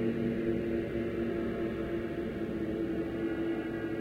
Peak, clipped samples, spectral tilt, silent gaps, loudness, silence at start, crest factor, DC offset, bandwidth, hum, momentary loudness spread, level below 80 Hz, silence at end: -20 dBFS; under 0.1%; -8.5 dB/octave; none; -34 LUFS; 0 s; 14 dB; under 0.1%; 7 kHz; none; 3 LU; -50 dBFS; 0 s